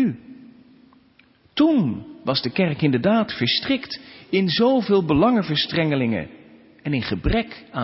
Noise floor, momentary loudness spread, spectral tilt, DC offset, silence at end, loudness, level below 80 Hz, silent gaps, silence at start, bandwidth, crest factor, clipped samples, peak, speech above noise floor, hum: -56 dBFS; 12 LU; -10 dB/octave; under 0.1%; 0 s; -21 LUFS; -40 dBFS; none; 0 s; 5.8 kHz; 16 dB; under 0.1%; -6 dBFS; 36 dB; none